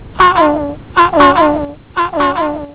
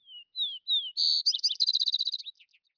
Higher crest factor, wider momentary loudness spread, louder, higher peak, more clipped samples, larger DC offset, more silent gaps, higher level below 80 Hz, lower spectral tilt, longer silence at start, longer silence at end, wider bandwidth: about the same, 12 dB vs 16 dB; about the same, 11 LU vs 13 LU; first, -12 LUFS vs -25 LUFS; first, 0 dBFS vs -16 dBFS; neither; first, 0.4% vs under 0.1%; neither; first, -36 dBFS vs under -90 dBFS; first, -9 dB/octave vs 8.5 dB/octave; about the same, 0 s vs 0.1 s; second, 0 s vs 0.45 s; second, 4 kHz vs 5.4 kHz